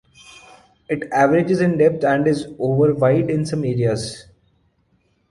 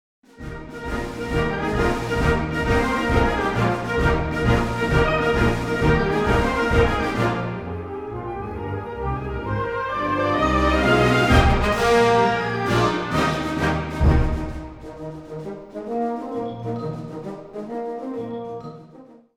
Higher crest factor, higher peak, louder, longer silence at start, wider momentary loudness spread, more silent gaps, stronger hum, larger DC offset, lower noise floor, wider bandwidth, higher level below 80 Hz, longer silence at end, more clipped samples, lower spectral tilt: about the same, 16 dB vs 18 dB; about the same, -2 dBFS vs -2 dBFS; first, -18 LUFS vs -21 LUFS; first, 0.9 s vs 0.4 s; second, 10 LU vs 17 LU; neither; neither; neither; first, -63 dBFS vs -46 dBFS; second, 11.5 kHz vs 16 kHz; second, -52 dBFS vs -30 dBFS; first, 1.1 s vs 0.3 s; neither; about the same, -7 dB/octave vs -6.5 dB/octave